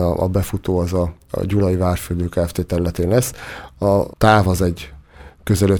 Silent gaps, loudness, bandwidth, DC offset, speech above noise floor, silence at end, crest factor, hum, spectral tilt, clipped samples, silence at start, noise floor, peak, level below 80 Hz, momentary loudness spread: none; -19 LUFS; 20 kHz; under 0.1%; 24 dB; 0 s; 18 dB; none; -6.5 dB/octave; under 0.1%; 0 s; -42 dBFS; 0 dBFS; -34 dBFS; 11 LU